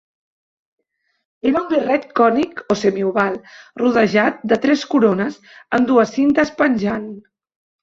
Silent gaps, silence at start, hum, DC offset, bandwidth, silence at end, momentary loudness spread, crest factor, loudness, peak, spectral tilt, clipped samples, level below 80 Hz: none; 1.45 s; none; under 0.1%; 7.6 kHz; 0.6 s; 8 LU; 16 dB; -17 LUFS; -2 dBFS; -6 dB/octave; under 0.1%; -56 dBFS